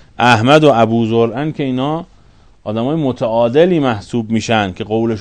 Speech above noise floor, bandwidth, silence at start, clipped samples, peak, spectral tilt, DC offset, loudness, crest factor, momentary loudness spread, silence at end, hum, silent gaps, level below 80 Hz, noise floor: 32 dB; 12 kHz; 0.2 s; 0.3%; 0 dBFS; -6.5 dB/octave; under 0.1%; -14 LUFS; 14 dB; 11 LU; 0 s; none; none; -48 dBFS; -45 dBFS